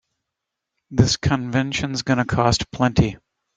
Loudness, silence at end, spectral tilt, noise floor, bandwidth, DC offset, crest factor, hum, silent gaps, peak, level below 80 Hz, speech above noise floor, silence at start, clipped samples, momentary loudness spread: -20 LUFS; 0.4 s; -5 dB/octave; -82 dBFS; 9.4 kHz; under 0.1%; 20 dB; none; none; -2 dBFS; -40 dBFS; 63 dB; 0.9 s; under 0.1%; 5 LU